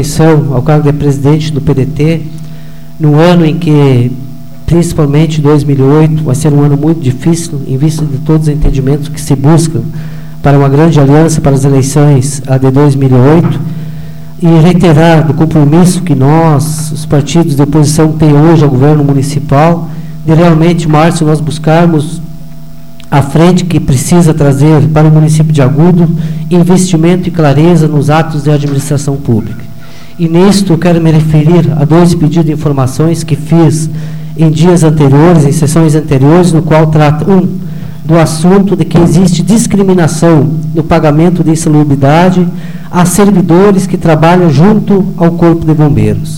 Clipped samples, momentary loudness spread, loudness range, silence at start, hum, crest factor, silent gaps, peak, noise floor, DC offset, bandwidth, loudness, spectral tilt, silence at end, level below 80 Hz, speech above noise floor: 0.2%; 8 LU; 3 LU; 0 s; none; 6 dB; none; 0 dBFS; -29 dBFS; 9%; 16 kHz; -7 LUFS; -7 dB/octave; 0 s; -28 dBFS; 23 dB